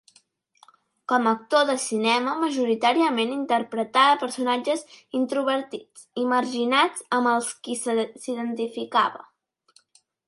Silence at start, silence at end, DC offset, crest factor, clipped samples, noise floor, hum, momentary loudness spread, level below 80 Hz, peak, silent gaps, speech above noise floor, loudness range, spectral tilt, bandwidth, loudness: 1.1 s; 1.05 s; under 0.1%; 18 dB; under 0.1%; -63 dBFS; none; 9 LU; -78 dBFS; -6 dBFS; none; 40 dB; 3 LU; -2.5 dB/octave; 11.5 kHz; -23 LUFS